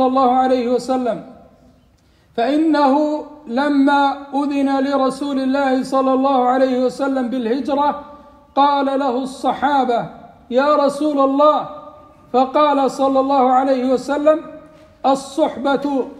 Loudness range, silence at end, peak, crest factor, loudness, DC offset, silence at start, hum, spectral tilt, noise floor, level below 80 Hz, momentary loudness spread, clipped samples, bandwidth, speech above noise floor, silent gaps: 2 LU; 0 s; -2 dBFS; 16 dB; -17 LUFS; under 0.1%; 0 s; none; -5 dB/octave; -54 dBFS; -56 dBFS; 7 LU; under 0.1%; 10.5 kHz; 37 dB; none